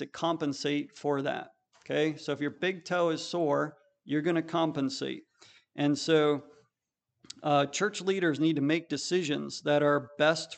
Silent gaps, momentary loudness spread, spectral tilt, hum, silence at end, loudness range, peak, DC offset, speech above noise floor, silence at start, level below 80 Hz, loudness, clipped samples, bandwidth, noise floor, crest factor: none; 9 LU; -5 dB/octave; none; 0 s; 3 LU; -12 dBFS; under 0.1%; 57 dB; 0 s; -80 dBFS; -30 LUFS; under 0.1%; 9.2 kHz; -86 dBFS; 18 dB